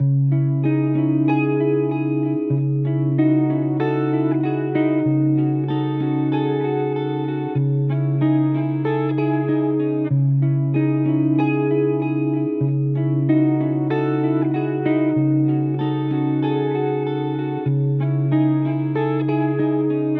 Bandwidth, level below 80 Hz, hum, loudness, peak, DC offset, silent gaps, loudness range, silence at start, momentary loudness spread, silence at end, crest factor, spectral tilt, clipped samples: 4 kHz; -70 dBFS; none; -20 LUFS; -8 dBFS; under 0.1%; none; 1 LU; 0 s; 3 LU; 0 s; 12 dB; -9 dB/octave; under 0.1%